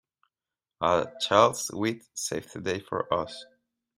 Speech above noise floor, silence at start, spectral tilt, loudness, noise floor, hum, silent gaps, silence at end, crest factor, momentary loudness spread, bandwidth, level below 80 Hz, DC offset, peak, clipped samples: over 63 dB; 0.8 s; -3.5 dB/octave; -27 LUFS; under -90 dBFS; none; none; 0.55 s; 24 dB; 12 LU; 16 kHz; -66 dBFS; under 0.1%; -6 dBFS; under 0.1%